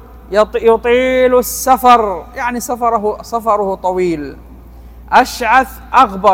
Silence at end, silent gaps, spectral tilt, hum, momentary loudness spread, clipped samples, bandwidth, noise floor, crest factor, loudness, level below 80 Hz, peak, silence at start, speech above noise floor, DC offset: 0 s; none; -4 dB/octave; none; 9 LU; 0.7%; 17 kHz; -35 dBFS; 14 dB; -13 LUFS; -36 dBFS; 0 dBFS; 0 s; 22 dB; under 0.1%